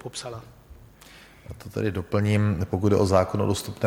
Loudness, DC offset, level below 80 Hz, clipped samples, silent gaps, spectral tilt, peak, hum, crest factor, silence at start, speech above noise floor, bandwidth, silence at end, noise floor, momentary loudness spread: -24 LUFS; under 0.1%; -50 dBFS; under 0.1%; none; -6.5 dB/octave; -6 dBFS; none; 20 dB; 0.05 s; 25 dB; 16.5 kHz; 0 s; -50 dBFS; 19 LU